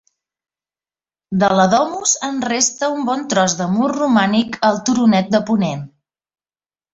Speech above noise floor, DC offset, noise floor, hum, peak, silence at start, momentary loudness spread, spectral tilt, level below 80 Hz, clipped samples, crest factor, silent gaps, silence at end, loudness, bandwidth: over 74 dB; under 0.1%; under -90 dBFS; none; -2 dBFS; 1.3 s; 6 LU; -4 dB/octave; -56 dBFS; under 0.1%; 16 dB; none; 1.05 s; -16 LUFS; 8 kHz